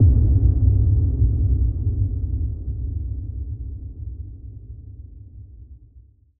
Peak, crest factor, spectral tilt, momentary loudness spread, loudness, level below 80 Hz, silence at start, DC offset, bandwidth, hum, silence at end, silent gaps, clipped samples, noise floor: -6 dBFS; 16 dB; -17 dB/octave; 24 LU; -22 LUFS; -24 dBFS; 0 s; under 0.1%; 0.9 kHz; none; 0.4 s; none; under 0.1%; -50 dBFS